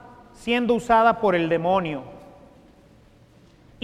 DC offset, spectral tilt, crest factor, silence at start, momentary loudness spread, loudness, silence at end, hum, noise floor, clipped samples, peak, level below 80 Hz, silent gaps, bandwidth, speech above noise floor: under 0.1%; -6 dB/octave; 18 dB; 0.4 s; 17 LU; -21 LUFS; 1.65 s; none; -53 dBFS; under 0.1%; -6 dBFS; -54 dBFS; none; 13.5 kHz; 33 dB